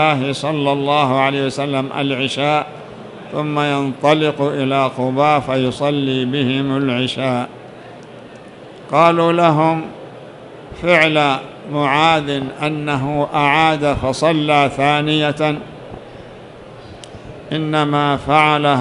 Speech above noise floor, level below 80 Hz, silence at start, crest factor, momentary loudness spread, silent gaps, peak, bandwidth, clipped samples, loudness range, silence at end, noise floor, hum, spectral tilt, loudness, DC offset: 21 dB; -48 dBFS; 0 s; 16 dB; 23 LU; none; 0 dBFS; 11.5 kHz; under 0.1%; 4 LU; 0 s; -37 dBFS; none; -6 dB/octave; -16 LUFS; under 0.1%